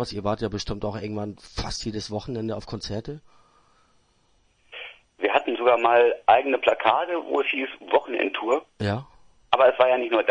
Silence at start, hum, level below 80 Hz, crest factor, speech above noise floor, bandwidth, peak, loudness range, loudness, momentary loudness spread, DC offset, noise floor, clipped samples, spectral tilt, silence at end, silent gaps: 0 s; none; -48 dBFS; 24 dB; 40 dB; 10 kHz; -2 dBFS; 12 LU; -24 LUFS; 15 LU; under 0.1%; -64 dBFS; under 0.1%; -5 dB/octave; 0 s; none